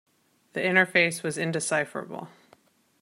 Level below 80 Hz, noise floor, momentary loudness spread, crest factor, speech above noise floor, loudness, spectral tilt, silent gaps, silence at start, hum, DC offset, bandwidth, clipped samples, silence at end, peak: -76 dBFS; -61 dBFS; 17 LU; 22 dB; 35 dB; -25 LUFS; -3.5 dB/octave; none; 0.55 s; none; under 0.1%; 15.5 kHz; under 0.1%; 0.75 s; -6 dBFS